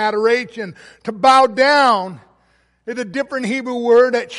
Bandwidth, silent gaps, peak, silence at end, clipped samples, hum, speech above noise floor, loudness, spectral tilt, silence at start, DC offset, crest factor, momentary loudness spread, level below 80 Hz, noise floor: 11.5 kHz; none; -2 dBFS; 0 s; under 0.1%; none; 43 dB; -15 LUFS; -4 dB/octave; 0 s; under 0.1%; 14 dB; 18 LU; -62 dBFS; -59 dBFS